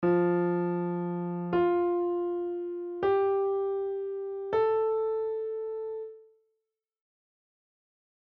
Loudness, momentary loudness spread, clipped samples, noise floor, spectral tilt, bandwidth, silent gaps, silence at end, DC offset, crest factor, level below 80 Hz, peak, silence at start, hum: -30 LUFS; 10 LU; under 0.1%; -84 dBFS; -7.5 dB/octave; 4.3 kHz; none; 2.15 s; under 0.1%; 14 dB; -68 dBFS; -16 dBFS; 0 s; none